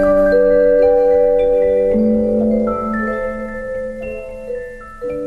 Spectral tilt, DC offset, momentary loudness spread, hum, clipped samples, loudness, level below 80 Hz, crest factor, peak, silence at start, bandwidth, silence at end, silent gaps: -8.5 dB/octave; under 0.1%; 15 LU; none; under 0.1%; -15 LUFS; -34 dBFS; 12 dB; -4 dBFS; 0 s; 4.5 kHz; 0 s; none